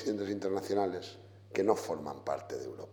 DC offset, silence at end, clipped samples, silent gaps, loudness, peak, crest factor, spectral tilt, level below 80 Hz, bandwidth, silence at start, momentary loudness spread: under 0.1%; 0 s; under 0.1%; none; -35 LUFS; -12 dBFS; 22 dB; -5.5 dB/octave; -76 dBFS; 19 kHz; 0 s; 11 LU